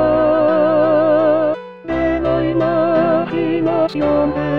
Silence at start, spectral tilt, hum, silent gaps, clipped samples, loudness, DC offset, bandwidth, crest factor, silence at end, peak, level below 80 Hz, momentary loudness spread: 0 s; -9 dB/octave; none; none; under 0.1%; -15 LUFS; 0.7%; 5.6 kHz; 12 dB; 0 s; -2 dBFS; -40 dBFS; 5 LU